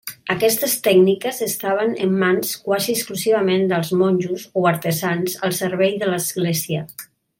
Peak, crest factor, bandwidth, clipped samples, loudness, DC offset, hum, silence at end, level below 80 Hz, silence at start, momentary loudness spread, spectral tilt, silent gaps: -4 dBFS; 16 dB; 17 kHz; under 0.1%; -19 LUFS; under 0.1%; none; 0.35 s; -64 dBFS; 0.05 s; 6 LU; -4.5 dB/octave; none